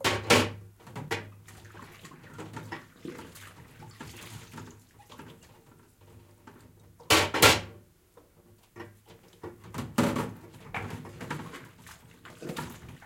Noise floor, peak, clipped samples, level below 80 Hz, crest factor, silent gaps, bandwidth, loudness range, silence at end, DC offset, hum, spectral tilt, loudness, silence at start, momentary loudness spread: -60 dBFS; -4 dBFS; under 0.1%; -58 dBFS; 28 dB; none; 16.5 kHz; 20 LU; 0 s; under 0.1%; none; -3 dB/octave; -27 LUFS; 0 s; 26 LU